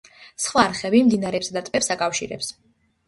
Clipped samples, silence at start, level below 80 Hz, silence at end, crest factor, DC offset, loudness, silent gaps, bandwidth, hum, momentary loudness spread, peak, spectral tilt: under 0.1%; 0.2 s; -58 dBFS; 0.55 s; 20 dB; under 0.1%; -22 LUFS; none; 11.5 kHz; none; 13 LU; -2 dBFS; -3.5 dB/octave